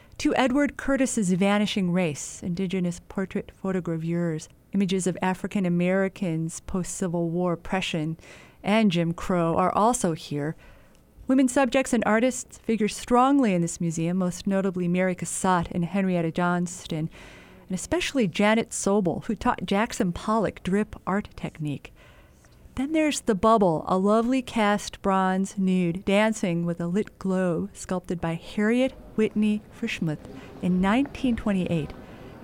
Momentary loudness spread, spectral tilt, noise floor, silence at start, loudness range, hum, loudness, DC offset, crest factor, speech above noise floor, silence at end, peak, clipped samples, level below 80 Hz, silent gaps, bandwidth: 10 LU; -5.5 dB/octave; -53 dBFS; 0.2 s; 4 LU; none; -25 LUFS; under 0.1%; 18 dB; 28 dB; 0 s; -8 dBFS; under 0.1%; -50 dBFS; none; 16 kHz